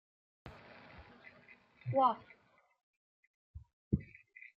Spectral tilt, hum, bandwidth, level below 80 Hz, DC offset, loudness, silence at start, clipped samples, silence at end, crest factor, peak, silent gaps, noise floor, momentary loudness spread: -6.5 dB/octave; none; 5.8 kHz; -62 dBFS; under 0.1%; -36 LUFS; 0.45 s; under 0.1%; 0.5 s; 24 dB; -18 dBFS; 2.83-3.54 s, 3.73-3.91 s; -68 dBFS; 27 LU